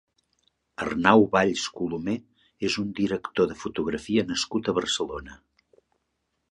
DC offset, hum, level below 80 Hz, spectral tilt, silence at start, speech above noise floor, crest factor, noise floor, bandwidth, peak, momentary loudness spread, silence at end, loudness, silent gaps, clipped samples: under 0.1%; none; -56 dBFS; -4.5 dB/octave; 0.8 s; 52 dB; 24 dB; -77 dBFS; 11 kHz; -2 dBFS; 13 LU; 1.15 s; -25 LUFS; none; under 0.1%